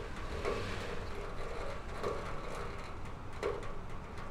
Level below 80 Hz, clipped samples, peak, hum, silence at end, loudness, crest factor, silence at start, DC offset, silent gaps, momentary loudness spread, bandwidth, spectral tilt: -44 dBFS; under 0.1%; -22 dBFS; none; 0 s; -42 LUFS; 16 dB; 0 s; under 0.1%; none; 8 LU; 12.5 kHz; -5.5 dB/octave